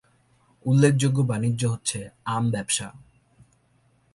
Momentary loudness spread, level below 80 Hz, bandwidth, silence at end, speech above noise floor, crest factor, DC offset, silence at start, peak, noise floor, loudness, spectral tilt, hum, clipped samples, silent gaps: 12 LU; -58 dBFS; 11.5 kHz; 1.15 s; 40 dB; 20 dB; under 0.1%; 0.65 s; -6 dBFS; -63 dBFS; -24 LUFS; -5.5 dB/octave; none; under 0.1%; none